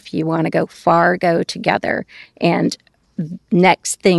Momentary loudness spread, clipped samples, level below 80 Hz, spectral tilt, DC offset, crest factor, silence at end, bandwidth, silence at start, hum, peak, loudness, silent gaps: 14 LU; under 0.1%; -56 dBFS; -5 dB/octave; under 0.1%; 16 dB; 0 s; 12.5 kHz; 0.05 s; none; -2 dBFS; -17 LUFS; none